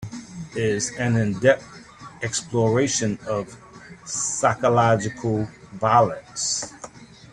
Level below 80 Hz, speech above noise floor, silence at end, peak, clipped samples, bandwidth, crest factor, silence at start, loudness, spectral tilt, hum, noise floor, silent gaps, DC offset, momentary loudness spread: -54 dBFS; 21 dB; 0.25 s; -4 dBFS; under 0.1%; 11 kHz; 20 dB; 0 s; -22 LUFS; -4.5 dB/octave; none; -42 dBFS; none; under 0.1%; 18 LU